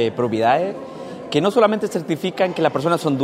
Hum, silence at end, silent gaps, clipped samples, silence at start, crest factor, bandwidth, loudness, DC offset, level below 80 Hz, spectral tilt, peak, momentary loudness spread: none; 0 s; none; under 0.1%; 0 s; 16 dB; 16 kHz; -19 LUFS; under 0.1%; -64 dBFS; -6 dB/octave; -2 dBFS; 11 LU